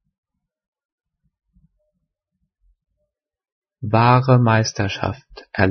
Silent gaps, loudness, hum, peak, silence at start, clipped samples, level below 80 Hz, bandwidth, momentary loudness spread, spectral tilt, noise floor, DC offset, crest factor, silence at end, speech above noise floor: none; -17 LUFS; none; -2 dBFS; 3.8 s; under 0.1%; -54 dBFS; 6.6 kHz; 17 LU; -6.5 dB/octave; -77 dBFS; under 0.1%; 20 dB; 0 s; 60 dB